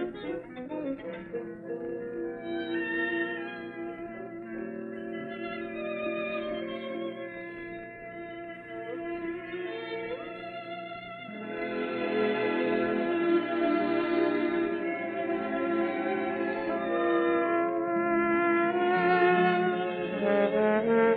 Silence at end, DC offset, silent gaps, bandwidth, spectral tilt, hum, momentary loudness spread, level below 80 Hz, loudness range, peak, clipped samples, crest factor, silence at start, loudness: 0 s; under 0.1%; none; 4.7 kHz; -9 dB/octave; none; 14 LU; -66 dBFS; 12 LU; -12 dBFS; under 0.1%; 18 dB; 0 s; -30 LUFS